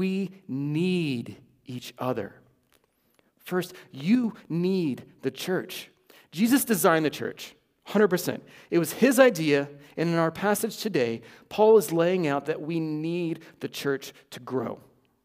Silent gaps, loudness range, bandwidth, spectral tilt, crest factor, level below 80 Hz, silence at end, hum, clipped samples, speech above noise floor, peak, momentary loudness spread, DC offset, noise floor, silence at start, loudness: none; 8 LU; 16 kHz; -5.5 dB/octave; 20 dB; -72 dBFS; 0.5 s; none; under 0.1%; 42 dB; -6 dBFS; 18 LU; under 0.1%; -68 dBFS; 0 s; -26 LUFS